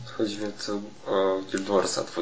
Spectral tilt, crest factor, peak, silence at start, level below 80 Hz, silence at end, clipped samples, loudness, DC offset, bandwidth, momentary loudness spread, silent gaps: -4 dB/octave; 18 dB; -8 dBFS; 0 s; -66 dBFS; 0 s; under 0.1%; -28 LUFS; 0.5%; 8 kHz; 8 LU; none